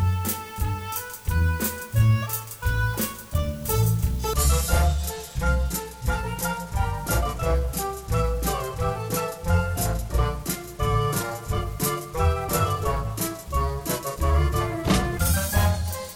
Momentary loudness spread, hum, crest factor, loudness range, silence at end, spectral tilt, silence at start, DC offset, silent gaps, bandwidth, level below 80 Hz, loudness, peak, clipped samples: 7 LU; none; 16 dB; 2 LU; 0 s; -5 dB/octave; 0 s; under 0.1%; none; over 20 kHz; -28 dBFS; -25 LUFS; -8 dBFS; under 0.1%